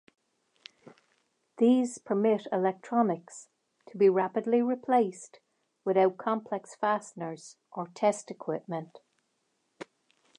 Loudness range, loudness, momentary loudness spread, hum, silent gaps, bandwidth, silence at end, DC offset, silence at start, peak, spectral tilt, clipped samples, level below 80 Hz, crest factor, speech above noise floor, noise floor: 6 LU; -29 LUFS; 23 LU; none; none; 11 kHz; 0.55 s; under 0.1%; 1.6 s; -12 dBFS; -6 dB/octave; under 0.1%; -86 dBFS; 18 dB; 48 dB; -77 dBFS